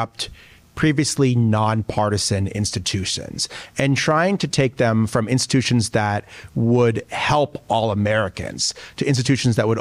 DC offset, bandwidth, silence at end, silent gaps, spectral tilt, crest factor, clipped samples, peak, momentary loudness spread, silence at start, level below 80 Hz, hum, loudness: under 0.1%; 14.5 kHz; 0 s; none; -5 dB/octave; 12 dB; under 0.1%; -8 dBFS; 8 LU; 0 s; -46 dBFS; none; -20 LUFS